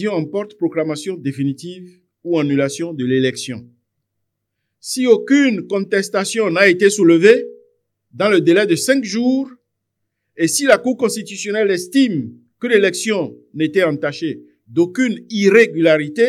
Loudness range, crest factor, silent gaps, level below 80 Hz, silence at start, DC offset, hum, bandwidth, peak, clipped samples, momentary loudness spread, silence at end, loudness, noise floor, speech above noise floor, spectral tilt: 7 LU; 16 dB; none; -68 dBFS; 0 s; under 0.1%; none; 14.5 kHz; 0 dBFS; under 0.1%; 14 LU; 0 s; -16 LUFS; -75 dBFS; 59 dB; -4.5 dB/octave